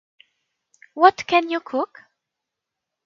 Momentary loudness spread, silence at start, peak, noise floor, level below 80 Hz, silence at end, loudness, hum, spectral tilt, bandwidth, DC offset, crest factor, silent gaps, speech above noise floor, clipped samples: 14 LU; 0.95 s; 0 dBFS; -84 dBFS; -70 dBFS; 1.2 s; -20 LUFS; none; -3.5 dB/octave; 7.4 kHz; under 0.1%; 24 dB; none; 65 dB; under 0.1%